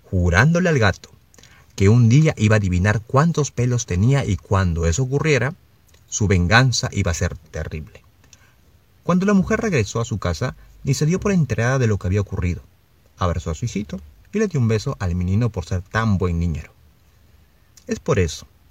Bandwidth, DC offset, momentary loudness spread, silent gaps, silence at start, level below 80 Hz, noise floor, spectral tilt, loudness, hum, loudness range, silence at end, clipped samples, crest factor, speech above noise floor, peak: 14.5 kHz; 0.1%; 13 LU; none; 0.1 s; -40 dBFS; -55 dBFS; -6 dB/octave; -20 LUFS; none; 6 LU; 0.25 s; under 0.1%; 20 dB; 37 dB; 0 dBFS